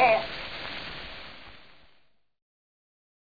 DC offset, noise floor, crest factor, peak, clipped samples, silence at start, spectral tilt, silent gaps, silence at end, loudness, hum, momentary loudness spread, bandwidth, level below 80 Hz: under 0.1%; -64 dBFS; 22 dB; -10 dBFS; under 0.1%; 0 s; -5 dB/octave; none; 0.85 s; -31 LUFS; none; 22 LU; 5 kHz; -56 dBFS